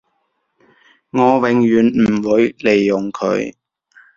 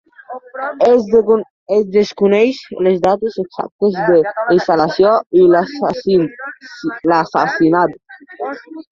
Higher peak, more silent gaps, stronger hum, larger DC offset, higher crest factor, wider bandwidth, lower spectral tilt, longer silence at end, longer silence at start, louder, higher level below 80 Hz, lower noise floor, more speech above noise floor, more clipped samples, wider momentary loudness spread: about the same, -2 dBFS vs 0 dBFS; second, none vs 1.50-1.66 s, 3.72-3.79 s, 5.26-5.30 s; neither; neither; about the same, 16 dB vs 14 dB; about the same, 7.4 kHz vs 7.2 kHz; about the same, -7 dB/octave vs -7 dB/octave; first, 0.65 s vs 0.1 s; first, 1.15 s vs 0.3 s; about the same, -15 LUFS vs -14 LUFS; about the same, -52 dBFS vs -54 dBFS; first, -68 dBFS vs -33 dBFS; first, 53 dB vs 19 dB; neither; second, 7 LU vs 14 LU